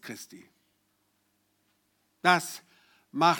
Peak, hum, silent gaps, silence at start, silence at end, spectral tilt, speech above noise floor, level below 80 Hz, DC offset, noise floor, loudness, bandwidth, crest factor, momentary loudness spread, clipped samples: -8 dBFS; none; none; 0.05 s; 0 s; -3.5 dB/octave; 46 dB; -88 dBFS; under 0.1%; -73 dBFS; -26 LUFS; 19.5 kHz; 24 dB; 20 LU; under 0.1%